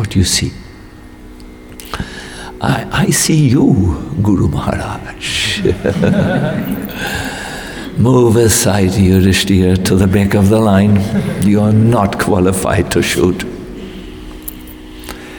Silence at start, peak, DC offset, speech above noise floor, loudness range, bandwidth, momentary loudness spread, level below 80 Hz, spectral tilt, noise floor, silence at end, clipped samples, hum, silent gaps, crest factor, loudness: 0 s; 0 dBFS; 0.2%; 23 dB; 6 LU; 19 kHz; 18 LU; -32 dBFS; -5.5 dB/octave; -34 dBFS; 0 s; under 0.1%; none; none; 14 dB; -13 LUFS